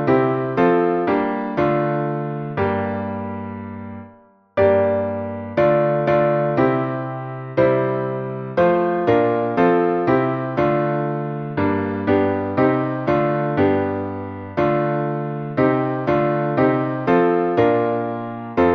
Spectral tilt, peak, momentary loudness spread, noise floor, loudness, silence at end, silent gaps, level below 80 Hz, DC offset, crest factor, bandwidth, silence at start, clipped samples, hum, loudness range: -9.5 dB/octave; -2 dBFS; 10 LU; -49 dBFS; -20 LUFS; 0 s; none; -52 dBFS; under 0.1%; 16 dB; 6.2 kHz; 0 s; under 0.1%; none; 4 LU